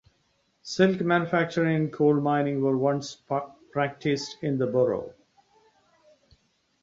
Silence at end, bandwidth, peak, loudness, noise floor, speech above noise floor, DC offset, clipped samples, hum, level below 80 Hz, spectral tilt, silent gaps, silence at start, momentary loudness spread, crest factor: 1.7 s; 7.8 kHz; -6 dBFS; -26 LUFS; -70 dBFS; 45 dB; under 0.1%; under 0.1%; none; -66 dBFS; -6.5 dB/octave; none; 0.65 s; 9 LU; 20 dB